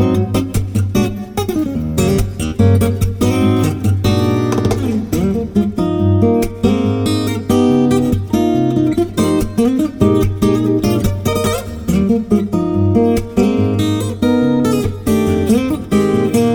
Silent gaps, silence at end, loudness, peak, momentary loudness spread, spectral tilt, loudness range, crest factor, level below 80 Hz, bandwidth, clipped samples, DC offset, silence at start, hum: none; 0 s; -15 LUFS; 0 dBFS; 4 LU; -7 dB/octave; 1 LU; 14 dB; -30 dBFS; 20 kHz; under 0.1%; under 0.1%; 0 s; none